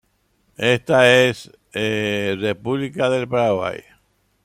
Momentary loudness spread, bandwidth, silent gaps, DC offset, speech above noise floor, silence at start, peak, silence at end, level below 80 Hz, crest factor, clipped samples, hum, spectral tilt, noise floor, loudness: 14 LU; 15 kHz; none; under 0.1%; 46 dB; 0.6 s; -2 dBFS; 0.65 s; -58 dBFS; 18 dB; under 0.1%; none; -5 dB/octave; -64 dBFS; -19 LUFS